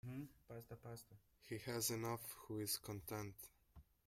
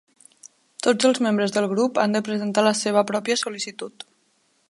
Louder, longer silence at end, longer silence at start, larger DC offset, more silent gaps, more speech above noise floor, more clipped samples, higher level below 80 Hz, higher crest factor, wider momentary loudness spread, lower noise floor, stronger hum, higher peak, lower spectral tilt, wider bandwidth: second, -47 LUFS vs -22 LUFS; second, 0.25 s vs 0.8 s; second, 0.05 s vs 0.45 s; neither; neither; second, 20 dB vs 44 dB; neither; about the same, -72 dBFS vs -74 dBFS; about the same, 20 dB vs 18 dB; about the same, 17 LU vs 17 LU; about the same, -68 dBFS vs -65 dBFS; neither; second, -28 dBFS vs -4 dBFS; about the same, -4 dB/octave vs -4 dB/octave; first, 16 kHz vs 11.5 kHz